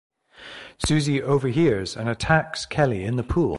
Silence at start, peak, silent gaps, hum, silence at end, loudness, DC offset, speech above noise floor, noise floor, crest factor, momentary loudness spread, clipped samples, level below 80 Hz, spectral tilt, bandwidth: 0.4 s; -4 dBFS; none; none; 0 s; -23 LUFS; under 0.1%; 22 dB; -43 dBFS; 18 dB; 9 LU; under 0.1%; -40 dBFS; -6 dB/octave; 11.5 kHz